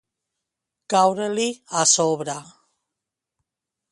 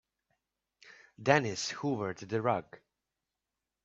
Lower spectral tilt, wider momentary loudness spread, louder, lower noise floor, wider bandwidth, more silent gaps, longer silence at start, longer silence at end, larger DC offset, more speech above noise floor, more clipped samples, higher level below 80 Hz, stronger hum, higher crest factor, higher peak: second, -2.5 dB/octave vs -4.5 dB/octave; first, 12 LU vs 8 LU; first, -20 LUFS vs -32 LUFS; second, -85 dBFS vs -89 dBFS; first, 11.5 kHz vs 8.4 kHz; neither; about the same, 0.9 s vs 0.85 s; first, 1.5 s vs 1.1 s; neither; first, 64 dB vs 57 dB; neither; about the same, -72 dBFS vs -74 dBFS; neither; second, 20 dB vs 26 dB; first, -4 dBFS vs -10 dBFS